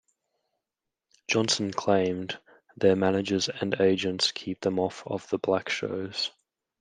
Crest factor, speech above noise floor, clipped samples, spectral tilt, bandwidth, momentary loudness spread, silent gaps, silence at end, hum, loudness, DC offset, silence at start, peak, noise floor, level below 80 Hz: 20 dB; 61 dB; under 0.1%; -4 dB/octave; 10 kHz; 8 LU; none; 0.5 s; none; -27 LUFS; under 0.1%; 1.3 s; -8 dBFS; -87 dBFS; -72 dBFS